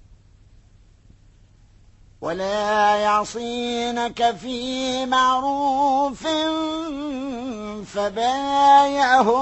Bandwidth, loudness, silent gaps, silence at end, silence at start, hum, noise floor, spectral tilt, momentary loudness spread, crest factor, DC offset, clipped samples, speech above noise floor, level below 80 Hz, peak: 8.4 kHz; -21 LUFS; none; 0 s; 2.2 s; none; -52 dBFS; -3.5 dB/octave; 13 LU; 16 dB; under 0.1%; under 0.1%; 31 dB; -52 dBFS; -4 dBFS